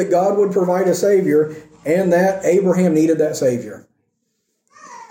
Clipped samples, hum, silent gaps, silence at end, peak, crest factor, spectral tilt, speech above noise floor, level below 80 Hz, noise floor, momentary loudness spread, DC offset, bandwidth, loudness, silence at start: under 0.1%; none; none; 0.05 s; -4 dBFS; 12 dB; -6.5 dB/octave; 55 dB; -60 dBFS; -70 dBFS; 7 LU; under 0.1%; 17 kHz; -16 LUFS; 0 s